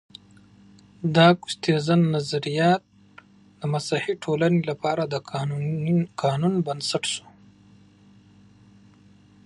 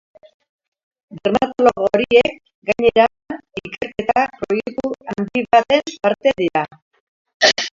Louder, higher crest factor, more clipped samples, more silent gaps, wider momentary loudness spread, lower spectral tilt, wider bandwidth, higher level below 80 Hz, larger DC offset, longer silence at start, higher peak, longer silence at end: second, -23 LUFS vs -17 LUFS; about the same, 22 dB vs 18 dB; neither; second, none vs 2.55-2.62 s, 6.82-6.91 s, 7.00-7.25 s, 7.34-7.40 s; second, 10 LU vs 13 LU; first, -6 dB/octave vs -3.5 dB/octave; first, 11.5 kHz vs 7.6 kHz; second, -66 dBFS vs -52 dBFS; neither; about the same, 1 s vs 1.1 s; second, -4 dBFS vs 0 dBFS; first, 2.25 s vs 0.05 s